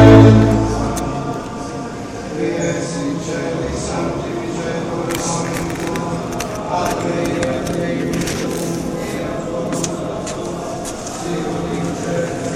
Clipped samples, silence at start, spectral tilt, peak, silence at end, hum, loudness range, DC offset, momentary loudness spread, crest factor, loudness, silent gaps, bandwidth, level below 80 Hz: under 0.1%; 0 s; -6 dB/octave; 0 dBFS; 0 s; none; 2 LU; under 0.1%; 6 LU; 18 dB; -19 LUFS; none; 15 kHz; -34 dBFS